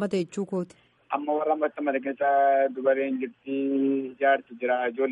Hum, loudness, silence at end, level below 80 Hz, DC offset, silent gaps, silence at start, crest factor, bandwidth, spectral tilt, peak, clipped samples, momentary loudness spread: none; -26 LUFS; 0 s; -78 dBFS; under 0.1%; none; 0 s; 16 dB; 10.5 kHz; -6.5 dB/octave; -10 dBFS; under 0.1%; 9 LU